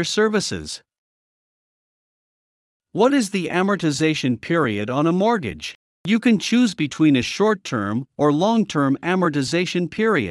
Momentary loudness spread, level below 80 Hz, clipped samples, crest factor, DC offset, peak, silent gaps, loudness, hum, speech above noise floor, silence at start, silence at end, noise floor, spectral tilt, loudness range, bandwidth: 9 LU; -58 dBFS; under 0.1%; 16 dB; under 0.1%; -4 dBFS; 0.98-2.80 s, 5.75-6.04 s; -20 LUFS; none; over 70 dB; 0 s; 0 s; under -90 dBFS; -5 dB/octave; 5 LU; 12 kHz